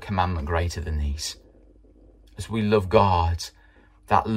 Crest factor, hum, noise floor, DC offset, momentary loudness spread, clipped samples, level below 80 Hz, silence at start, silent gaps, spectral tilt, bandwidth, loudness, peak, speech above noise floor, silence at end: 22 dB; none; -54 dBFS; under 0.1%; 14 LU; under 0.1%; -36 dBFS; 0 s; none; -6 dB/octave; 15.5 kHz; -24 LUFS; -4 dBFS; 31 dB; 0 s